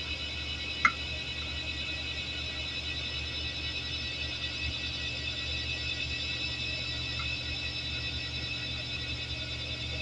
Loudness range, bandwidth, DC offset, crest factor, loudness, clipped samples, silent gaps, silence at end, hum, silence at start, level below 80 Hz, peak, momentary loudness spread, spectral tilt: 1 LU; 11 kHz; under 0.1%; 28 dB; -33 LUFS; under 0.1%; none; 0 s; none; 0 s; -44 dBFS; -8 dBFS; 2 LU; -3 dB/octave